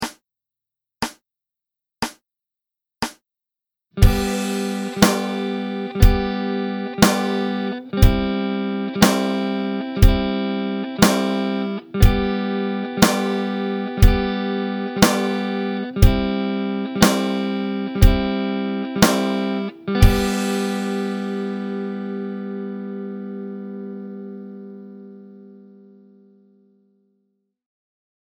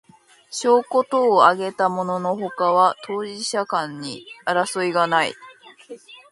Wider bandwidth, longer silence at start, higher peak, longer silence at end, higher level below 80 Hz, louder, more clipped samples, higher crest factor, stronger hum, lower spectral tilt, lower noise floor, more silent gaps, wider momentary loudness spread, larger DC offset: first, over 20 kHz vs 11.5 kHz; second, 0 s vs 0.5 s; about the same, 0 dBFS vs 0 dBFS; first, 2.75 s vs 0.15 s; first, -26 dBFS vs -72 dBFS; about the same, -21 LUFS vs -20 LUFS; neither; about the same, 20 dB vs 20 dB; neither; first, -5.5 dB/octave vs -4 dB/octave; first, -87 dBFS vs -47 dBFS; neither; about the same, 14 LU vs 15 LU; neither